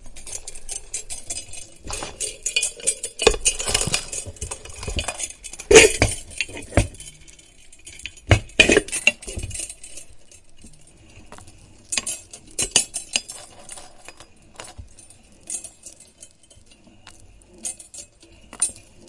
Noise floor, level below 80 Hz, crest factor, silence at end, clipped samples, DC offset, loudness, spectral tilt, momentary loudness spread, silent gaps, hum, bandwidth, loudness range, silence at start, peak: -50 dBFS; -38 dBFS; 24 dB; 0.3 s; under 0.1%; under 0.1%; -21 LUFS; -2.5 dB/octave; 24 LU; none; none; 12 kHz; 18 LU; 0 s; 0 dBFS